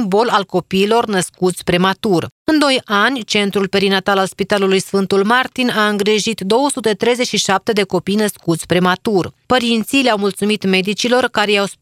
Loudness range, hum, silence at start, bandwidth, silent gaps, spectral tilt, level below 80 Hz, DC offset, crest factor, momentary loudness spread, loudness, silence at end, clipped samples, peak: 1 LU; none; 0 s; 16 kHz; 2.32-2.45 s; -4 dB/octave; -52 dBFS; under 0.1%; 16 dB; 4 LU; -15 LUFS; 0.1 s; under 0.1%; 0 dBFS